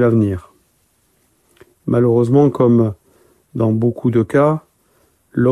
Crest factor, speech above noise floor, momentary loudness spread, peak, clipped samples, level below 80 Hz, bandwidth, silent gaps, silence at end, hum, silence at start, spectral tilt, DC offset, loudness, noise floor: 14 dB; 47 dB; 15 LU; -2 dBFS; under 0.1%; -52 dBFS; 10.5 kHz; none; 0 s; none; 0 s; -10 dB/octave; under 0.1%; -16 LUFS; -60 dBFS